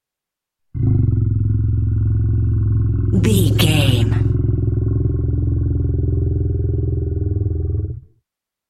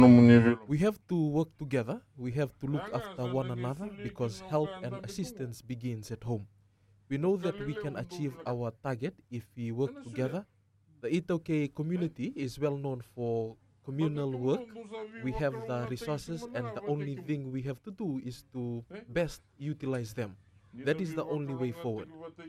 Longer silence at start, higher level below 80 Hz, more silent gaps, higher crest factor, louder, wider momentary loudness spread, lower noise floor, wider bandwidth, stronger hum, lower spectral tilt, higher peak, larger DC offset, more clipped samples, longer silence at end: first, 0.75 s vs 0 s; first, -26 dBFS vs -60 dBFS; neither; second, 16 dB vs 24 dB; first, -18 LUFS vs -33 LUFS; second, 7 LU vs 10 LU; first, -85 dBFS vs -65 dBFS; about the same, 14 kHz vs 13.5 kHz; neither; second, -6.5 dB/octave vs -8 dB/octave; first, -2 dBFS vs -8 dBFS; neither; neither; first, 0.7 s vs 0 s